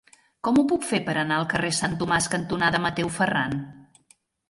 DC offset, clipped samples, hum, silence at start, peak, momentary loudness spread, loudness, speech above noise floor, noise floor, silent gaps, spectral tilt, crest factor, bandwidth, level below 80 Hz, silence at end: under 0.1%; under 0.1%; none; 0.45 s; -10 dBFS; 6 LU; -24 LUFS; 38 dB; -62 dBFS; none; -4 dB/octave; 16 dB; 11.5 kHz; -54 dBFS; 0.65 s